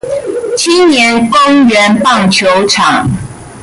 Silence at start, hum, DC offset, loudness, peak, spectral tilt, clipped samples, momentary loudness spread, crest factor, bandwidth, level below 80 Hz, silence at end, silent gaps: 0.05 s; none; under 0.1%; -8 LUFS; 0 dBFS; -4 dB/octave; under 0.1%; 10 LU; 8 dB; 11.5 kHz; -38 dBFS; 0 s; none